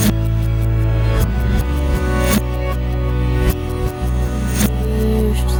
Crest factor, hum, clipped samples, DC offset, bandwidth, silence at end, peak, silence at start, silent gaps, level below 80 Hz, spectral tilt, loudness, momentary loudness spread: 14 dB; none; under 0.1%; under 0.1%; over 20 kHz; 0 s; -2 dBFS; 0 s; none; -18 dBFS; -6 dB/octave; -18 LUFS; 4 LU